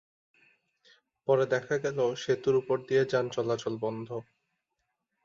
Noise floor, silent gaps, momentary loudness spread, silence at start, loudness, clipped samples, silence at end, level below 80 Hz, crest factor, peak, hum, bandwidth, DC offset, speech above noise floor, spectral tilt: -82 dBFS; none; 11 LU; 1.3 s; -30 LUFS; under 0.1%; 1.05 s; -72 dBFS; 18 dB; -14 dBFS; none; 7.6 kHz; under 0.1%; 54 dB; -5.5 dB/octave